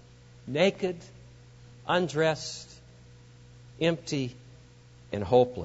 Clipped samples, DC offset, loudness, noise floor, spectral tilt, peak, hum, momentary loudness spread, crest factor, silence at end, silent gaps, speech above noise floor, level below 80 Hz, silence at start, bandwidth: under 0.1%; under 0.1%; -28 LUFS; -53 dBFS; -5.5 dB/octave; -8 dBFS; none; 18 LU; 22 dB; 0 s; none; 26 dB; -60 dBFS; 0.45 s; 8 kHz